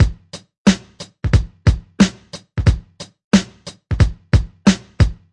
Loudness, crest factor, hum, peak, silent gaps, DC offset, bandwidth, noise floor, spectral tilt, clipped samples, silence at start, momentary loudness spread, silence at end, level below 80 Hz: -18 LUFS; 16 dB; none; 0 dBFS; 0.58-0.65 s, 3.24-3.31 s; under 0.1%; 11 kHz; -37 dBFS; -6 dB/octave; under 0.1%; 0 s; 20 LU; 0.2 s; -24 dBFS